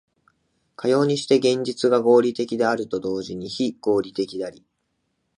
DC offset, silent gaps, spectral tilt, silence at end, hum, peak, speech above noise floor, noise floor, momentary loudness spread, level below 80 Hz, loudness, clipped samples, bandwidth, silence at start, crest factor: under 0.1%; none; -5.5 dB/octave; 0.9 s; none; -4 dBFS; 53 dB; -74 dBFS; 11 LU; -64 dBFS; -22 LUFS; under 0.1%; 11 kHz; 0.8 s; 18 dB